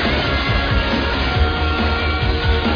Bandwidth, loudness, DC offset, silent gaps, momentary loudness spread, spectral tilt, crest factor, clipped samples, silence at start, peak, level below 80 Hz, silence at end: 5.4 kHz; -18 LUFS; under 0.1%; none; 1 LU; -6.5 dB/octave; 12 dB; under 0.1%; 0 s; -4 dBFS; -22 dBFS; 0 s